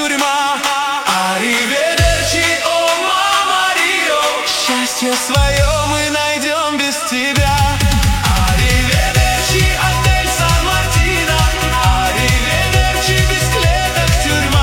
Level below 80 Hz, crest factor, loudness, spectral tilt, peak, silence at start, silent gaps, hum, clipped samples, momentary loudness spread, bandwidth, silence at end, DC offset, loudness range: -20 dBFS; 14 dB; -13 LUFS; -3.5 dB/octave; 0 dBFS; 0 s; none; none; under 0.1%; 2 LU; 16.5 kHz; 0 s; under 0.1%; 1 LU